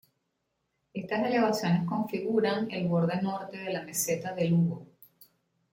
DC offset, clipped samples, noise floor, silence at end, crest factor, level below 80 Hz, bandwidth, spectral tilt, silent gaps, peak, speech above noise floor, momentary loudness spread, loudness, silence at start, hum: under 0.1%; under 0.1%; -80 dBFS; 0.85 s; 16 dB; -70 dBFS; 16.5 kHz; -5.5 dB/octave; none; -14 dBFS; 51 dB; 9 LU; -29 LUFS; 0.95 s; none